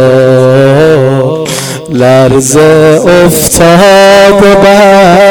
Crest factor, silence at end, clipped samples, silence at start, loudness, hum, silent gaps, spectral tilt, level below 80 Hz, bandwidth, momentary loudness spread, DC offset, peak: 4 dB; 0 s; 10%; 0 s; -4 LUFS; none; none; -5 dB/octave; -30 dBFS; over 20 kHz; 8 LU; 1%; 0 dBFS